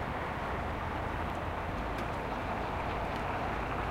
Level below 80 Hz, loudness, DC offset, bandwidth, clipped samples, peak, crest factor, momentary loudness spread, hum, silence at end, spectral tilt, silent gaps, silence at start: -44 dBFS; -36 LUFS; under 0.1%; 16 kHz; under 0.1%; -22 dBFS; 14 dB; 1 LU; none; 0 s; -6.5 dB/octave; none; 0 s